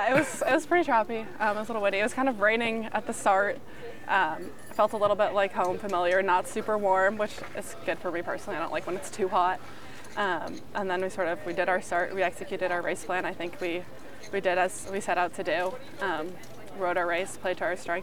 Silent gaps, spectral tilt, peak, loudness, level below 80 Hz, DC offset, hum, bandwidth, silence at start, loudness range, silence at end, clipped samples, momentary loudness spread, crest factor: none; -4 dB/octave; -10 dBFS; -28 LUFS; -62 dBFS; 1%; none; 19 kHz; 0 s; 4 LU; 0 s; under 0.1%; 11 LU; 18 dB